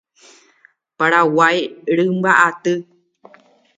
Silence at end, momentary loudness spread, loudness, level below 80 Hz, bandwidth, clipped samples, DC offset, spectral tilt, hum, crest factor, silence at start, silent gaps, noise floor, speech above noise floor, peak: 0.95 s; 9 LU; -16 LUFS; -70 dBFS; 9.4 kHz; under 0.1%; under 0.1%; -5 dB/octave; none; 18 dB; 1 s; none; -55 dBFS; 40 dB; 0 dBFS